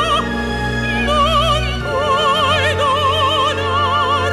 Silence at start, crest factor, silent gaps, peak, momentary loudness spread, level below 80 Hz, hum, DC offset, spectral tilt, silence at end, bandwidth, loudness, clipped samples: 0 s; 12 dB; none; -4 dBFS; 5 LU; -28 dBFS; none; under 0.1%; -4.5 dB/octave; 0 s; 14 kHz; -15 LUFS; under 0.1%